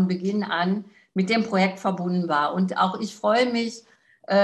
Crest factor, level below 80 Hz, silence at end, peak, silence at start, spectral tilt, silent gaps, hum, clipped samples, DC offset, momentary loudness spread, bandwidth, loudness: 16 dB; -70 dBFS; 0 s; -8 dBFS; 0 s; -6 dB/octave; none; none; under 0.1%; under 0.1%; 7 LU; 9.2 kHz; -24 LUFS